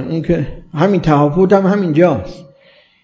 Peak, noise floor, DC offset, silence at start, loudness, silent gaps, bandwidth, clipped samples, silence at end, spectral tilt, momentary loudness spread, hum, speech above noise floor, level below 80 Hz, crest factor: 0 dBFS; -49 dBFS; under 0.1%; 0 s; -14 LUFS; none; 7.6 kHz; under 0.1%; 0.6 s; -8.5 dB/octave; 10 LU; none; 36 dB; -38 dBFS; 14 dB